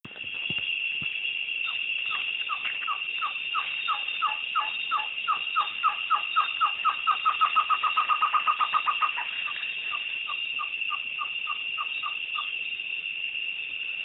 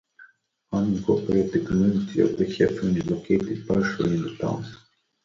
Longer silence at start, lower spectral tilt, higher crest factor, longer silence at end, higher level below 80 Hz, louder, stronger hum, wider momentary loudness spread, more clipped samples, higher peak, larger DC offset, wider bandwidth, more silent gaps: second, 0.05 s vs 0.2 s; second, -2.5 dB/octave vs -7.5 dB/octave; about the same, 18 dB vs 18 dB; second, 0 s vs 0.5 s; second, -74 dBFS vs -50 dBFS; second, -27 LUFS vs -24 LUFS; neither; about the same, 6 LU vs 7 LU; neither; second, -12 dBFS vs -6 dBFS; neither; second, 5.6 kHz vs 7.4 kHz; neither